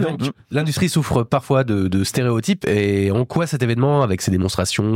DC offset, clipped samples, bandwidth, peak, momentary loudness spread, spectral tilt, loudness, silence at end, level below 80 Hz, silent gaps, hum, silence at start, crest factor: under 0.1%; under 0.1%; 16.5 kHz; -4 dBFS; 4 LU; -6 dB/octave; -19 LUFS; 0 s; -46 dBFS; none; none; 0 s; 14 dB